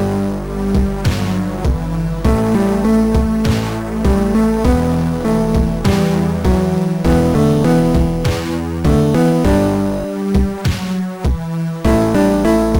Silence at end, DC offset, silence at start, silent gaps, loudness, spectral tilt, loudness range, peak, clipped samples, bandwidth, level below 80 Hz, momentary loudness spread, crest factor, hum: 0 s; under 0.1%; 0 s; none; -15 LUFS; -7.5 dB/octave; 2 LU; -4 dBFS; under 0.1%; 18 kHz; -22 dBFS; 7 LU; 12 dB; none